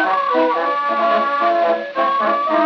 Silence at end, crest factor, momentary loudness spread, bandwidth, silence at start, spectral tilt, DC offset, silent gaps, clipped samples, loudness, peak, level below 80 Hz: 0 s; 12 dB; 2 LU; 6.4 kHz; 0 s; -5 dB/octave; under 0.1%; none; under 0.1%; -17 LUFS; -4 dBFS; -82 dBFS